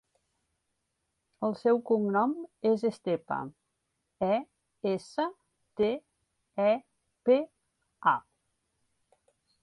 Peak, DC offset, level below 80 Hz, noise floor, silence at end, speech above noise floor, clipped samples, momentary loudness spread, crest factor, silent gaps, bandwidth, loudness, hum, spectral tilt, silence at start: -12 dBFS; under 0.1%; -74 dBFS; -81 dBFS; 1.4 s; 53 dB; under 0.1%; 10 LU; 20 dB; none; 11 kHz; -30 LUFS; none; -7 dB/octave; 1.4 s